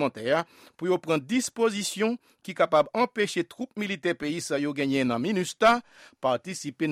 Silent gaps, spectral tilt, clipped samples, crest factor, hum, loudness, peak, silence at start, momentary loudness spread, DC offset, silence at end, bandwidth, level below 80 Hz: none; -4.5 dB/octave; under 0.1%; 18 dB; none; -27 LUFS; -8 dBFS; 0 s; 10 LU; under 0.1%; 0 s; 16 kHz; -66 dBFS